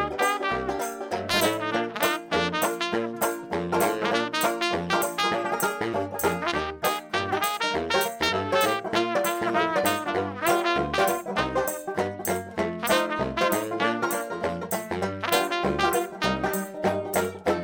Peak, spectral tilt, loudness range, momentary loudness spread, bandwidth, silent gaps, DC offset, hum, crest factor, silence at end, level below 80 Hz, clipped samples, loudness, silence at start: -6 dBFS; -3.5 dB/octave; 2 LU; 5 LU; over 20 kHz; none; under 0.1%; none; 20 dB; 0 s; -54 dBFS; under 0.1%; -26 LUFS; 0 s